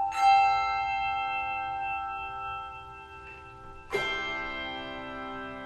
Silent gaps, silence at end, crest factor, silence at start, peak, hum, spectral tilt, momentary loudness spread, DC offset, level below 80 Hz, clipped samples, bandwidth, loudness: none; 0 s; 18 dB; 0 s; -12 dBFS; none; -3 dB/octave; 22 LU; under 0.1%; -54 dBFS; under 0.1%; 12 kHz; -29 LUFS